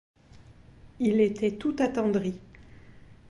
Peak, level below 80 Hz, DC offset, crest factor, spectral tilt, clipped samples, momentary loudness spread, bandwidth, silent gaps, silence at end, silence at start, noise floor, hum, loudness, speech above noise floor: -12 dBFS; -56 dBFS; under 0.1%; 18 dB; -7 dB/octave; under 0.1%; 8 LU; 11.5 kHz; none; 0.15 s; 0.35 s; -53 dBFS; none; -27 LUFS; 27 dB